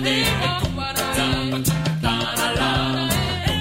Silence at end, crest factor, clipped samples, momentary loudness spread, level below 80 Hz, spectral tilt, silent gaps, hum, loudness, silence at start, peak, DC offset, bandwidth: 0 s; 16 dB; under 0.1%; 3 LU; -34 dBFS; -4 dB/octave; none; none; -21 LUFS; 0 s; -6 dBFS; under 0.1%; 16.5 kHz